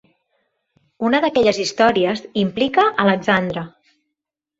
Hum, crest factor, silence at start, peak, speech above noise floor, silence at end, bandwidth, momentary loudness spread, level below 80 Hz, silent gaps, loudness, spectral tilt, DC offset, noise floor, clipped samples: none; 18 dB; 1 s; -2 dBFS; 65 dB; 0.9 s; 8 kHz; 9 LU; -56 dBFS; none; -18 LUFS; -5 dB/octave; under 0.1%; -82 dBFS; under 0.1%